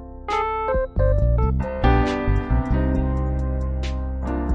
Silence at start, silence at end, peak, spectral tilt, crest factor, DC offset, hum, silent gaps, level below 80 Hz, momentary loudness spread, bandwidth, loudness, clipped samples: 0 s; 0 s; -6 dBFS; -8.5 dB/octave; 16 dB; under 0.1%; none; none; -24 dBFS; 7 LU; 7.4 kHz; -23 LUFS; under 0.1%